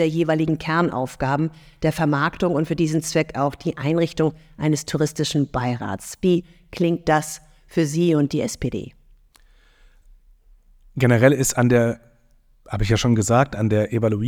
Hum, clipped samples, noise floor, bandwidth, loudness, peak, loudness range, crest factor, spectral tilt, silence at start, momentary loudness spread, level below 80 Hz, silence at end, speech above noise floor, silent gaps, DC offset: none; under 0.1%; -56 dBFS; 19 kHz; -21 LUFS; 0 dBFS; 5 LU; 20 dB; -6 dB/octave; 0 s; 10 LU; -44 dBFS; 0 s; 36 dB; none; under 0.1%